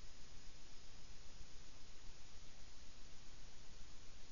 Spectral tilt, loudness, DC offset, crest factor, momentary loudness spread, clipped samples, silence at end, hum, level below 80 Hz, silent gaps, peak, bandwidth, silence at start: -3 dB/octave; -61 LUFS; 0.6%; 12 dB; 1 LU; under 0.1%; 0 s; none; -58 dBFS; none; -36 dBFS; 7.2 kHz; 0 s